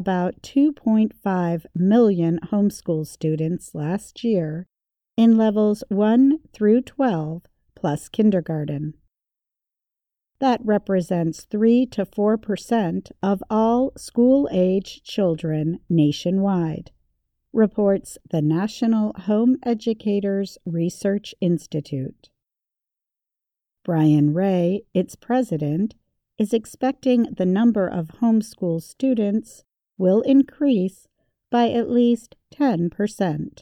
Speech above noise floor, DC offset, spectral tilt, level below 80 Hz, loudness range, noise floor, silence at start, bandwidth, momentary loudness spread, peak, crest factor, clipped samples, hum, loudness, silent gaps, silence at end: 67 dB; under 0.1%; -7.5 dB/octave; -58 dBFS; 5 LU; -87 dBFS; 0 s; 13.5 kHz; 10 LU; -6 dBFS; 14 dB; under 0.1%; none; -21 LUFS; none; 0.1 s